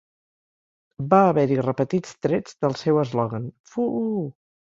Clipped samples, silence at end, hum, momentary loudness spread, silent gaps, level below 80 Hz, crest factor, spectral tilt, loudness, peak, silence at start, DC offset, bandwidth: under 0.1%; 0.45 s; none; 13 LU; 3.60-3.64 s; -62 dBFS; 20 dB; -8 dB/octave; -23 LUFS; -2 dBFS; 1 s; under 0.1%; 7.8 kHz